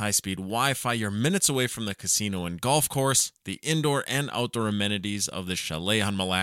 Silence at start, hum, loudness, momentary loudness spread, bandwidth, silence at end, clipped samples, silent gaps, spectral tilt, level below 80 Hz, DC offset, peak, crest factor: 0 s; none; -26 LUFS; 7 LU; 17 kHz; 0 s; under 0.1%; none; -3 dB/octave; -58 dBFS; under 0.1%; -8 dBFS; 20 dB